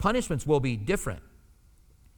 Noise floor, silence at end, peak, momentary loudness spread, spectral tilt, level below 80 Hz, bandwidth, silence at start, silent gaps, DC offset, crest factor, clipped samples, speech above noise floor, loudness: -58 dBFS; 0.95 s; -12 dBFS; 10 LU; -5.5 dB/octave; -44 dBFS; 20 kHz; 0 s; none; under 0.1%; 18 dB; under 0.1%; 31 dB; -28 LUFS